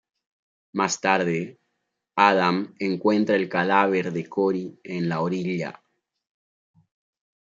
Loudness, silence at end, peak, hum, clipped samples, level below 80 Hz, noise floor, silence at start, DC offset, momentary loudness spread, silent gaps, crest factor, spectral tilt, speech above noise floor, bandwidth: -23 LUFS; 1.8 s; -2 dBFS; none; under 0.1%; -72 dBFS; -78 dBFS; 0.75 s; under 0.1%; 11 LU; none; 24 dB; -5 dB/octave; 55 dB; 7.8 kHz